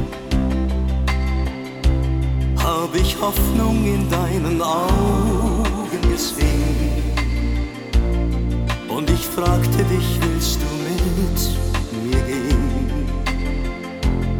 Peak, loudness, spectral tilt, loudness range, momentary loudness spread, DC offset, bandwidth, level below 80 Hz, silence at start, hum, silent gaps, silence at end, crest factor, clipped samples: -4 dBFS; -20 LUFS; -5.5 dB/octave; 2 LU; 5 LU; 0.2%; 19.5 kHz; -22 dBFS; 0 s; none; none; 0 s; 16 dB; under 0.1%